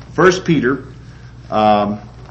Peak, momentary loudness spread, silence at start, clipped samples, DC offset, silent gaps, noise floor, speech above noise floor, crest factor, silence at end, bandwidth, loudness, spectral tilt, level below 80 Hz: 0 dBFS; 13 LU; 0 s; under 0.1%; under 0.1%; none; -36 dBFS; 22 dB; 16 dB; 0 s; 8.2 kHz; -15 LUFS; -6 dB/octave; -42 dBFS